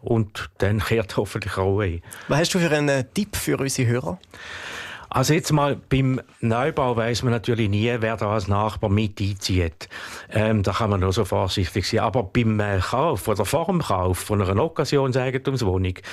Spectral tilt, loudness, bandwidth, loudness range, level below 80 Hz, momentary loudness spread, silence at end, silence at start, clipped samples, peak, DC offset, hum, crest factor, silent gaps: -5.5 dB/octave; -23 LUFS; 14 kHz; 1 LU; -46 dBFS; 6 LU; 0 s; 0.05 s; under 0.1%; -8 dBFS; under 0.1%; none; 14 dB; none